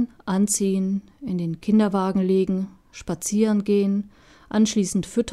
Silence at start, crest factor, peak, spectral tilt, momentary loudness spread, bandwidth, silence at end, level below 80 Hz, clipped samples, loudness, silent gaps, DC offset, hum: 0 s; 14 dB; -8 dBFS; -5.5 dB/octave; 10 LU; 13.5 kHz; 0 s; -54 dBFS; under 0.1%; -23 LUFS; none; under 0.1%; none